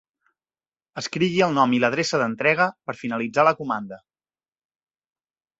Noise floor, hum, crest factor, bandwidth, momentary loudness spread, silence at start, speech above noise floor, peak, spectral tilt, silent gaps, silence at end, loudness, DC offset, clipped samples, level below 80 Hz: under -90 dBFS; none; 20 dB; 8 kHz; 12 LU; 0.95 s; over 68 dB; -4 dBFS; -5 dB/octave; none; 1.6 s; -22 LUFS; under 0.1%; under 0.1%; -66 dBFS